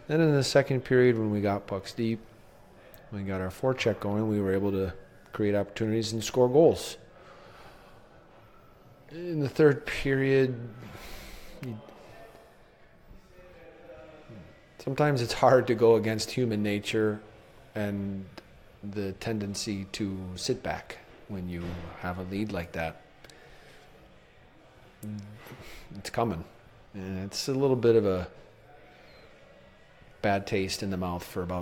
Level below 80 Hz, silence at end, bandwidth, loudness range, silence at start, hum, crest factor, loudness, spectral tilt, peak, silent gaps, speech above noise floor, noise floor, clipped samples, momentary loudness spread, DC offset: -54 dBFS; 0 s; 17 kHz; 12 LU; 0 s; none; 24 dB; -28 LUFS; -6 dB/octave; -6 dBFS; none; 28 dB; -56 dBFS; under 0.1%; 23 LU; under 0.1%